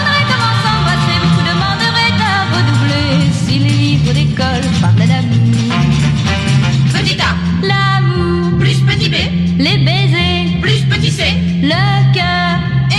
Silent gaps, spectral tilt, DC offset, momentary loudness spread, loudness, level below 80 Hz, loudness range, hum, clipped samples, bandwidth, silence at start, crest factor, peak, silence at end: none; -5.5 dB/octave; 0.2%; 2 LU; -12 LUFS; -30 dBFS; 0 LU; none; under 0.1%; 11.5 kHz; 0 s; 10 dB; -2 dBFS; 0 s